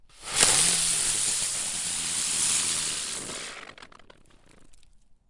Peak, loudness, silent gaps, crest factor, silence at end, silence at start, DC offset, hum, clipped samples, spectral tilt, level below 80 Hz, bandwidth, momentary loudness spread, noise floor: -2 dBFS; -23 LUFS; none; 26 dB; 0.35 s; 0.15 s; under 0.1%; none; under 0.1%; 0.5 dB/octave; -54 dBFS; 11.5 kHz; 14 LU; -54 dBFS